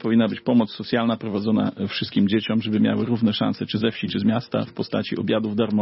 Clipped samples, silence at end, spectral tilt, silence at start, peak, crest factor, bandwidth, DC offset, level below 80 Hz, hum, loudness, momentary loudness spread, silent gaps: under 0.1%; 0 s; -10.5 dB/octave; 0 s; -8 dBFS; 14 dB; 5.8 kHz; under 0.1%; -62 dBFS; none; -23 LUFS; 5 LU; none